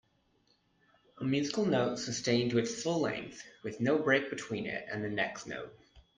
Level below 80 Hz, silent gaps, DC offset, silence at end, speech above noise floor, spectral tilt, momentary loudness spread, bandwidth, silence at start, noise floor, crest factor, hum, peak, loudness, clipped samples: -68 dBFS; none; under 0.1%; 0.15 s; 39 dB; -4.5 dB/octave; 14 LU; 9.8 kHz; 1.15 s; -72 dBFS; 22 dB; none; -12 dBFS; -33 LUFS; under 0.1%